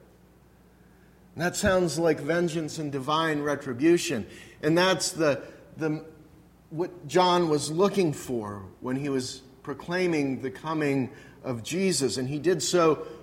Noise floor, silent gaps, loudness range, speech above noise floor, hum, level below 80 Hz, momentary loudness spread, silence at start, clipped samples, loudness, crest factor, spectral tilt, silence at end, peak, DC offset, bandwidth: -57 dBFS; none; 3 LU; 30 dB; none; -56 dBFS; 14 LU; 1.35 s; under 0.1%; -27 LUFS; 18 dB; -4.5 dB/octave; 0 s; -8 dBFS; under 0.1%; 16.5 kHz